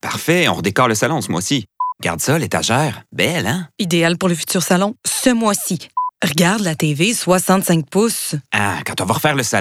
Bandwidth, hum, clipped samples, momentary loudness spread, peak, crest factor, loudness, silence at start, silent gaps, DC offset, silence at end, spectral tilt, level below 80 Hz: 16.5 kHz; none; under 0.1%; 6 LU; 0 dBFS; 16 dB; -17 LUFS; 0.05 s; none; under 0.1%; 0 s; -4 dB/octave; -54 dBFS